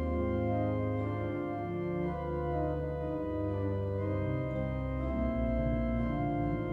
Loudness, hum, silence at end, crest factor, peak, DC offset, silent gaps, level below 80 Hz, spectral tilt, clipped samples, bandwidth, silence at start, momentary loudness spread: -34 LUFS; none; 0 s; 12 dB; -20 dBFS; under 0.1%; none; -42 dBFS; -10.5 dB/octave; under 0.1%; 4.7 kHz; 0 s; 4 LU